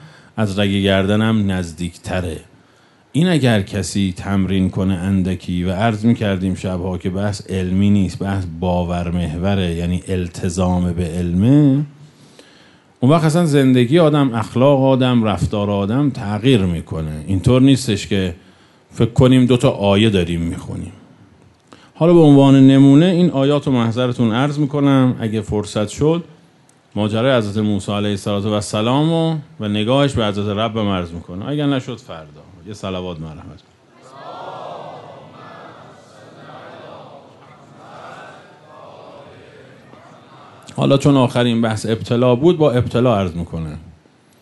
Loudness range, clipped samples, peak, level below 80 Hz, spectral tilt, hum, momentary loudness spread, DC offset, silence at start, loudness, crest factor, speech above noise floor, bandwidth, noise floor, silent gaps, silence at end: 13 LU; under 0.1%; -2 dBFS; -42 dBFS; -7 dB/octave; none; 18 LU; under 0.1%; 0.05 s; -16 LUFS; 16 dB; 36 dB; 11.5 kHz; -51 dBFS; none; 0.5 s